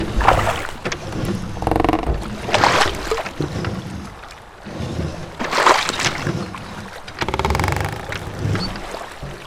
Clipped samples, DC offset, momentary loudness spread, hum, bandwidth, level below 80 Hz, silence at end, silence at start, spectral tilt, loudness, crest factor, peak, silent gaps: under 0.1%; under 0.1%; 17 LU; none; 18 kHz; -32 dBFS; 0 s; 0 s; -4.5 dB/octave; -21 LUFS; 22 dB; 0 dBFS; none